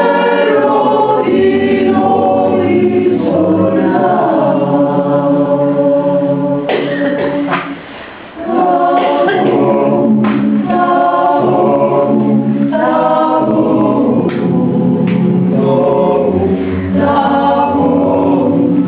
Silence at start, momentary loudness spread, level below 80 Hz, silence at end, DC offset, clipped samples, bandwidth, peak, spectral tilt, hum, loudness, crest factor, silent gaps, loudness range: 0 s; 4 LU; -42 dBFS; 0 s; 0.1%; under 0.1%; 4 kHz; 0 dBFS; -11.5 dB/octave; none; -11 LUFS; 10 dB; none; 2 LU